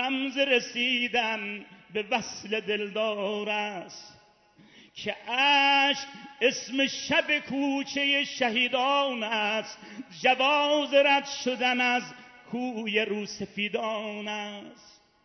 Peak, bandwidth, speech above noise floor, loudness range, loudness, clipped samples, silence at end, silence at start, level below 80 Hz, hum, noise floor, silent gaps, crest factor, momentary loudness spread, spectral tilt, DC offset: -8 dBFS; 6.4 kHz; 31 dB; 7 LU; -26 LUFS; under 0.1%; 0.35 s; 0 s; -72 dBFS; none; -59 dBFS; none; 20 dB; 14 LU; -2.5 dB/octave; under 0.1%